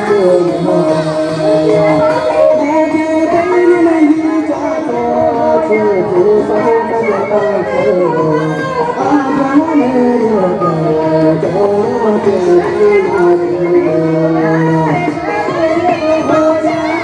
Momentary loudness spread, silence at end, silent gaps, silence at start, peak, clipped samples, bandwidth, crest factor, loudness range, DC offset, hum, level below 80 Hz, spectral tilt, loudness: 4 LU; 0 s; none; 0 s; 0 dBFS; under 0.1%; 10.5 kHz; 10 dB; 1 LU; under 0.1%; none; -46 dBFS; -7.5 dB/octave; -11 LUFS